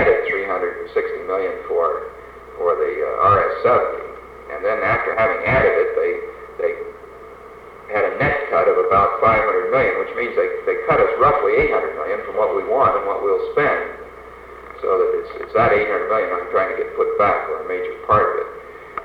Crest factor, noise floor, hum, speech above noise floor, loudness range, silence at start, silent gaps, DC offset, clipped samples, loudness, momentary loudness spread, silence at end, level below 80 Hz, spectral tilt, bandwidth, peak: 16 dB; -39 dBFS; none; 21 dB; 3 LU; 0 s; none; under 0.1%; under 0.1%; -19 LUFS; 19 LU; 0 s; -44 dBFS; -7.5 dB/octave; 5.4 kHz; -4 dBFS